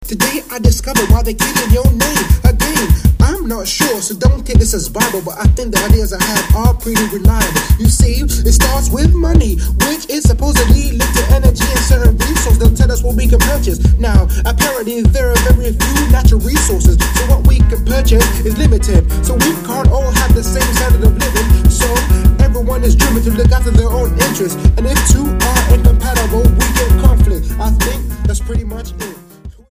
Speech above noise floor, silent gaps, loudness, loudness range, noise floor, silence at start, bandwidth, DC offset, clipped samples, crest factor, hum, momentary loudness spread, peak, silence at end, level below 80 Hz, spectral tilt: 23 dB; none; -12 LUFS; 2 LU; -34 dBFS; 0 s; 16 kHz; under 0.1%; 0.1%; 10 dB; none; 4 LU; 0 dBFS; 0.2 s; -12 dBFS; -5 dB/octave